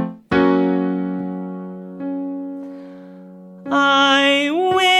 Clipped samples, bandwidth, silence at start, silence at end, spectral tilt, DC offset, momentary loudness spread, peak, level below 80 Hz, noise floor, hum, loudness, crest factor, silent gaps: under 0.1%; 12.5 kHz; 0 s; 0 s; -4.5 dB/octave; under 0.1%; 21 LU; -2 dBFS; -54 dBFS; -39 dBFS; none; -17 LUFS; 16 dB; none